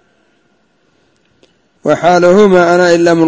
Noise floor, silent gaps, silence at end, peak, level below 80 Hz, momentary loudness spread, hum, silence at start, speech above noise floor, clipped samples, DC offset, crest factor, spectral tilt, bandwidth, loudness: -56 dBFS; none; 0 s; 0 dBFS; -50 dBFS; 8 LU; none; 1.85 s; 49 dB; 0.6%; under 0.1%; 10 dB; -6 dB/octave; 8 kHz; -8 LUFS